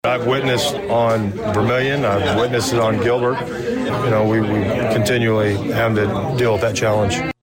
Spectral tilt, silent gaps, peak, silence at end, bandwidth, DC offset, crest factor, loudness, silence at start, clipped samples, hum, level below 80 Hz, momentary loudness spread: -5.5 dB/octave; none; -8 dBFS; 0.1 s; 16.5 kHz; under 0.1%; 8 dB; -18 LUFS; 0.05 s; under 0.1%; none; -44 dBFS; 4 LU